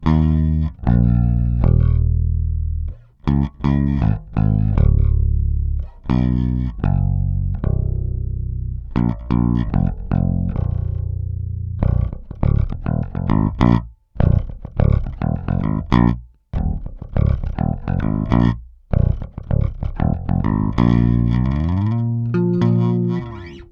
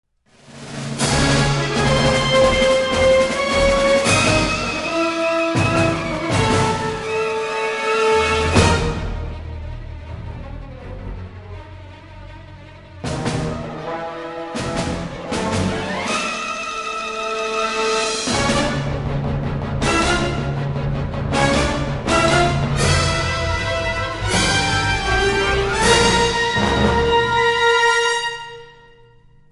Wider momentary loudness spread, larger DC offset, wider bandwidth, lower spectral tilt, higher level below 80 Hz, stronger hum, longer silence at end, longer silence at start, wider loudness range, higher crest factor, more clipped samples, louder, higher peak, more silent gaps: second, 9 LU vs 18 LU; neither; second, 5.4 kHz vs 11.5 kHz; first, -10.5 dB/octave vs -4 dB/octave; first, -22 dBFS vs -32 dBFS; neither; second, 0.05 s vs 0.8 s; second, 0 s vs 0.5 s; second, 3 LU vs 13 LU; about the same, 18 dB vs 18 dB; neither; about the same, -20 LUFS vs -18 LUFS; about the same, 0 dBFS vs 0 dBFS; neither